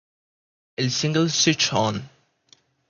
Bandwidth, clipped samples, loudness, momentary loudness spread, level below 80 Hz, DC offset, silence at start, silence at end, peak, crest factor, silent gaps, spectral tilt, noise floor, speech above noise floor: 7.4 kHz; under 0.1%; -21 LUFS; 12 LU; -60 dBFS; under 0.1%; 0.8 s; 0.85 s; -4 dBFS; 20 dB; none; -3.5 dB/octave; -59 dBFS; 37 dB